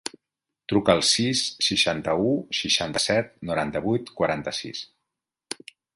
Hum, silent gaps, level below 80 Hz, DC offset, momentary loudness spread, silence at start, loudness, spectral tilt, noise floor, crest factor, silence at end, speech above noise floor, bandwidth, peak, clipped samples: none; none; -54 dBFS; under 0.1%; 18 LU; 0.7 s; -23 LUFS; -3.5 dB/octave; -86 dBFS; 22 dB; 1.1 s; 62 dB; 11.5 kHz; -4 dBFS; under 0.1%